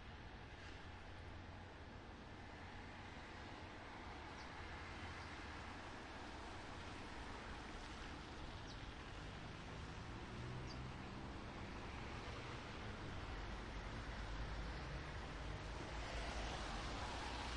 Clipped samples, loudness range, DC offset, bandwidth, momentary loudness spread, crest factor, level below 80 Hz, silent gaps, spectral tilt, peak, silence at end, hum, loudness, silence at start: under 0.1%; 6 LU; under 0.1%; 11 kHz; 8 LU; 16 dB; -56 dBFS; none; -5 dB/octave; -34 dBFS; 0 s; none; -51 LUFS; 0 s